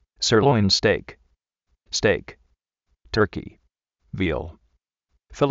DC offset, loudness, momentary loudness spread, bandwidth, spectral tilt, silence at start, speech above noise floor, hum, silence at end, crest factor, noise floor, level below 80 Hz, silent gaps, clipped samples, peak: under 0.1%; -22 LUFS; 14 LU; 8 kHz; -4 dB/octave; 0.2 s; 52 dB; none; 0 s; 18 dB; -73 dBFS; -46 dBFS; none; under 0.1%; -6 dBFS